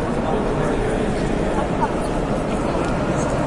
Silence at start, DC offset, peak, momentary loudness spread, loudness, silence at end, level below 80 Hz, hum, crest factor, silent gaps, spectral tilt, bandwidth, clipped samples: 0 s; under 0.1%; -6 dBFS; 1 LU; -21 LUFS; 0 s; -30 dBFS; none; 16 dB; none; -6.5 dB/octave; 11.5 kHz; under 0.1%